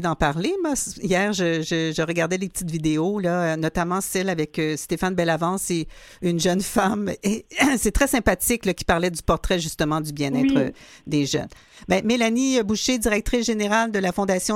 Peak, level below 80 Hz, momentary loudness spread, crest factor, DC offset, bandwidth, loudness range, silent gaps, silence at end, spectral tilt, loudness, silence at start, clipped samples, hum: -2 dBFS; -38 dBFS; 6 LU; 20 dB; under 0.1%; 16.5 kHz; 2 LU; none; 0 s; -4.5 dB/octave; -22 LUFS; 0 s; under 0.1%; none